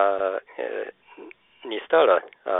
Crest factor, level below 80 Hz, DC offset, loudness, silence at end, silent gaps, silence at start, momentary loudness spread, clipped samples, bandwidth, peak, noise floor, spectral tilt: 18 dB; -76 dBFS; under 0.1%; -24 LUFS; 0 s; none; 0 s; 16 LU; under 0.1%; 4 kHz; -6 dBFS; -46 dBFS; -7.5 dB/octave